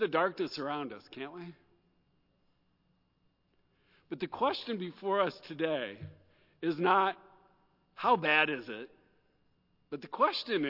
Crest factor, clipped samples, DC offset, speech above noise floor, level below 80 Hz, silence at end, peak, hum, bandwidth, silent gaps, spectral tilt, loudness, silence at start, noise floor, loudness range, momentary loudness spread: 22 dB; under 0.1%; under 0.1%; 42 dB; -80 dBFS; 0 s; -12 dBFS; none; 5.8 kHz; none; -6 dB/octave; -32 LUFS; 0 s; -74 dBFS; 14 LU; 19 LU